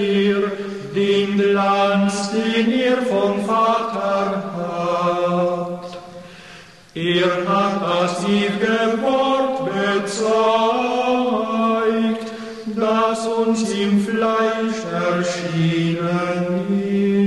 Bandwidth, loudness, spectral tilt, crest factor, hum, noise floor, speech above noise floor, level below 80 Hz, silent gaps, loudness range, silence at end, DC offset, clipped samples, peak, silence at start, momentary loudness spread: 12 kHz; -19 LUFS; -5.5 dB/octave; 14 dB; none; -42 dBFS; 24 dB; -60 dBFS; none; 3 LU; 0 s; 0.2%; under 0.1%; -6 dBFS; 0 s; 8 LU